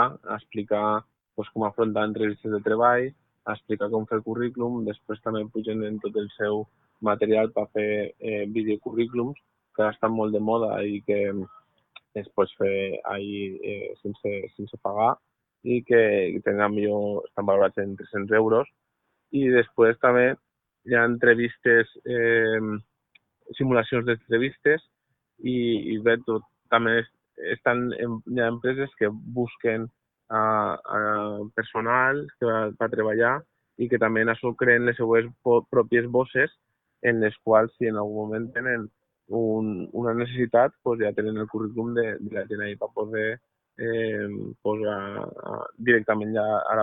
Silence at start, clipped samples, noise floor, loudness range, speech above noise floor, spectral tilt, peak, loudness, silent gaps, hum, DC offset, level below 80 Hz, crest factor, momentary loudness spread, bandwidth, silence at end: 0 s; under 0.1%; -76 dBFS; 6 LU; 52 dB; -10.5 dB/octave; -4 dBFS; -25 LUFS; none; none; under 0.1%; -64 dBFS; 20 dB; 12 LU; 4 kHz; 0 s